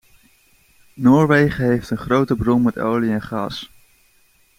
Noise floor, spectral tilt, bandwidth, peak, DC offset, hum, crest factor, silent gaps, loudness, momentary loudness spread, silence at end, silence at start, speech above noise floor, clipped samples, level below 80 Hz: -57 dBFS; -7.5 dB/octave; 15.5 kHz; -2 dBFS; under 0.1%; none; 18 dB; none; -18 LUFS; 12 LU; 0.9 s; 0.95 s; 40 dB; under 0.1%; -44 dBFS